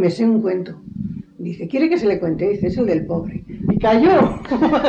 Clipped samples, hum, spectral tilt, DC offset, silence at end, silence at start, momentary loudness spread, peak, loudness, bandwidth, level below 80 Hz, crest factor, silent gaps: under 0.1%; none; -8 dB/octave; under 0.1%; 0 s; 0 s; 16 LU; -4 dBFS; -18 LUFS; 8.4 kHz; -42 dBFS; 14 dB; none